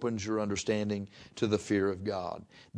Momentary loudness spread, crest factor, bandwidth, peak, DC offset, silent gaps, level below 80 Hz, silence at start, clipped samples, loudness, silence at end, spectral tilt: 11 LU; 18 dB; 11 kHz; -14 dBFS; under 0.1%; none; -64 dBFS; 0 s; under 0.1%; -32 LUFS; 0.15 s; -5.5 dB/octave